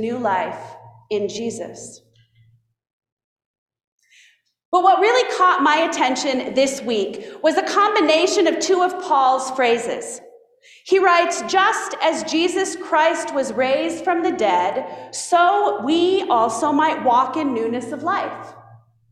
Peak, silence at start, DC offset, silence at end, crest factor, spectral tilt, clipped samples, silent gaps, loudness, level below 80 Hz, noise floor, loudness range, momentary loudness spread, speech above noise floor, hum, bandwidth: -4 dBFS; 0 s; under 0.1%; 0.35 s; 16 dB; -2.5 dB/octave; under 0.1%; 2.93-3.01 s, 3.12-3.17 s, 3.24-3.36 s, 3.45-3.66 s, 3.84-3.99 s, 4.65-4.72 s; -19 LUFS; -66 dBFS; -57 dBFS; 8 LU; 12 LU; 38 dB; none; 13.5 kHz